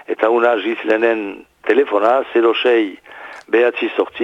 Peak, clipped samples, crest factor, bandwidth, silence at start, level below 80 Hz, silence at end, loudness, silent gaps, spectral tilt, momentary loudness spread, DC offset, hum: -2 dBFS; under 0.1%; 14 dB; 7.6 kHz; 0.1 s; -64 dBFS; 0 s; -16 LUFS; none; -5 dB/octave; 13 LU; under 0.1%; none